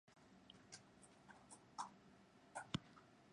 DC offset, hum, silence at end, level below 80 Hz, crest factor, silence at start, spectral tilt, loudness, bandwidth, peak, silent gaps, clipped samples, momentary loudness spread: under 0.1%; none; 0 s; -78 dBFS; 32 dB; 0.05 s; -4 dB/octave; -56 LUFS; 10.5 kHz; -26 dBFS; none; under 0.1%; 18 LU